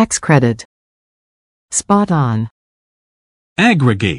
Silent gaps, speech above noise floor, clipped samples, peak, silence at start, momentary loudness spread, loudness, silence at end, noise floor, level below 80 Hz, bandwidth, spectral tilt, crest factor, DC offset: 0.65-1.69 s, 2.51-3.56 s; over 77 dB; under 0.1%; 0 dBFS; 0 s; 13 LU; -14 LUFS; 0 s; under -90 dBFS; -48 dBFS; 12 kHz; -5 dB/octave; 16 dB; under 0.1%